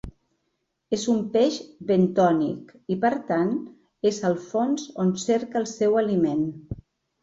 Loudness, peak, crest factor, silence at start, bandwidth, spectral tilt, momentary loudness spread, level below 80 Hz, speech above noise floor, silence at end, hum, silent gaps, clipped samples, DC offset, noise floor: -24 LUFS; -8 dBFS; 16 dB; 0.05 s; 8 kHz; -6 dB/octave; 10 LU; -54 dBFS; 53 dB; 0.4 s; none; none; under 0.1%; under 0.1%; -76 dBFS